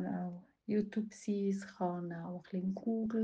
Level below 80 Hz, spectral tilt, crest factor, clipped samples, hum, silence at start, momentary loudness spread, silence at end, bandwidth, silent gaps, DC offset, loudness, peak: -74 dBFS; -8 dB/octave; 14 dB; under 0.1%; none; 0 s; 8 LU; 0 s; 9 kHz; none; under 0.1%; -38 LUFS; -24 dBFS